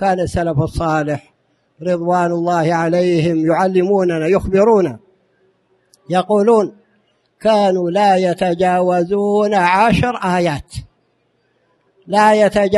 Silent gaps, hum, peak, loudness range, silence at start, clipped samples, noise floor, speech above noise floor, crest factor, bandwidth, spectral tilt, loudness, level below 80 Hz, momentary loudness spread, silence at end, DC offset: none; none; 0 dBFS; 3 LU; 0 s; under 0.1%; -62 dBFS; 48 dB; 16 dB; 12 kHz; -6.5 dB/octave; -15 LUFS; -40 dBFS; 8 LU; 0 s; under 0.1%